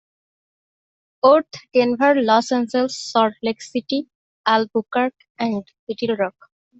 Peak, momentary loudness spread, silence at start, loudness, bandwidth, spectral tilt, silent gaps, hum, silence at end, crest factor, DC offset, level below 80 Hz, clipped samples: -2 dBFS; 11 LU; 1.25 s; -20 LUFS; 8.2 kHz; -4.5 dB/octave; 4.15-4.44 s, 5.30-5.35 s, 5.79-5.87 s; none; 0.5 s; 18 dB; under 0.1%; -68 dBFS; under 0.1%